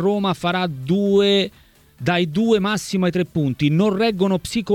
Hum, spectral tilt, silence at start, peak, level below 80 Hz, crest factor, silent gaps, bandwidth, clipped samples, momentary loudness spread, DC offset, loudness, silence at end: none; -6 dB/octave; 0 s; -6 dBFS; -50 dBFS; 14 dB; none; 16 kHz; under 0.1%; 6 LU; under 0.1%; -19 LUFS; 0 s